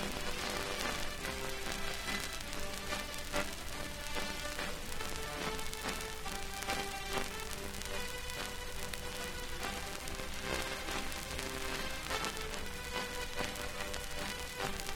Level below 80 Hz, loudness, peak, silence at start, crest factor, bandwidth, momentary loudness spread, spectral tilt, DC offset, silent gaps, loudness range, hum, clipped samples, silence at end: -46 dBFS; -39 LUFS; -14 dBFS; 0 s; 24 dB; 19 kHz; 4 LU; -2.5 dB/octave; under 0.1%; none; 1 LU; none; under 0.1%; 0 s